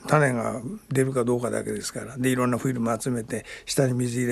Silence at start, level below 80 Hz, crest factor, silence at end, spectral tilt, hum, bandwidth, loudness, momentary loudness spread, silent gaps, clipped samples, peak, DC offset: 0 s; -56 dBFS; 18 dB; 0 s; -5.5 dB/octave; none; 13 kHz; -26 LUFS; 8 LU; none; under 0.1%; -6 dBFS; under 0.1%